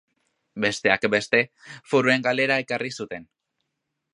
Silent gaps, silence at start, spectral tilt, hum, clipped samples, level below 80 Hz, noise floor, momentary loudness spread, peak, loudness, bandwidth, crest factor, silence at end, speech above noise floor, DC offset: none; 0.55 s; -4.5 dB/octave; none; under 0.1%; -66 dBFS; -80 dBFS; 14 LU; -2 dBFS; -22 LUFS; 11 kHz; 22 dB; 0.9 s; 57 dB; under 0.1%